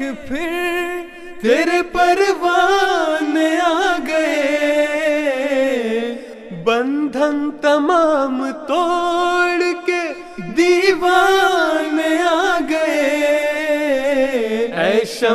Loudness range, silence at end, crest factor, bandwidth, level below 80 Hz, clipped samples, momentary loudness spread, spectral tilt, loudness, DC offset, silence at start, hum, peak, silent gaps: 3 LU; 0 s; 16 dB; 14.5 kHz; -50 dBFS; under 0.1%; 8 LU; -3.5 dB/octave; -17 LUFS; under 0.1%; 0 s; none; 0 dBFS; none